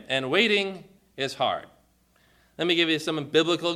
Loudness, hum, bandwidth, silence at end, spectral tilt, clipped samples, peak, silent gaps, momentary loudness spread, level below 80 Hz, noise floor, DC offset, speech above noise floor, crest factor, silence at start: -24 LUFS; none; 14 kHz; 0 s; -4 dB/octave; under 0.1%; -6 dBFS; none; 11 LU; -68 dBFS; -63 dBFS; under 0.1%; 38 dB; 20 dB; 0.1 s